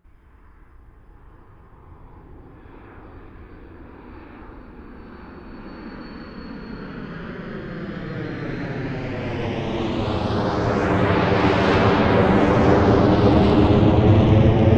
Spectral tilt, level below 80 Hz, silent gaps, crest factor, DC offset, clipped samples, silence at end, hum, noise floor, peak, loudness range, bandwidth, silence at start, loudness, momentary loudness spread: -8 dB/octave; -34 dBFS; none; 18 dB; under 0.1%; under 0.1%; 0 s; none; -49 dBFS; -2 dBFS; 24 LU; 7.6 kHz; 1.9 s; -19 LUFS; 24 LU